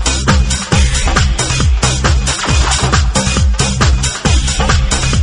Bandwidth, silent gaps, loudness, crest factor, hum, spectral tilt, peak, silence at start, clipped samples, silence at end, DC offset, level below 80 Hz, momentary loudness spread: 11.5 kHz; none; -12 LUFS; 12 dB; none; -3.5 dB/octave; 0 dBFS; 0 s; under 0.1%; 0 s; under 0.1%; -14 dBFS; 1 LU